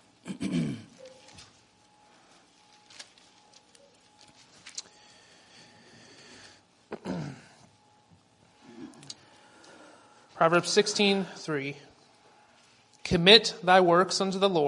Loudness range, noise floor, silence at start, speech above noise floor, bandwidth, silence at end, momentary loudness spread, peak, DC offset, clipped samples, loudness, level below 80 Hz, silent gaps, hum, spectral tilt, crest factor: 25 LU; -61 dBFS; 0.25 s; 38 dB; 11 kHz; 0 s; 29 LU; -2 dBFS; under 0.1%; under 0.1%; -24 LUFS; -62 dBFS; none; none; -4 dB/octave; 28 dB